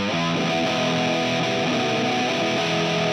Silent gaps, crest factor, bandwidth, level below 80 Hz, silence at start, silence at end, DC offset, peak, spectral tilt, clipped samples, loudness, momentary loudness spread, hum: none; 12 dB; 18.5 kHz; -60 dBFS; 0 s; 0 s; under 0.1%; -10 dBFS; -4.5 dB/octave; under 0.1%; -22 LUFS; 1 LU; none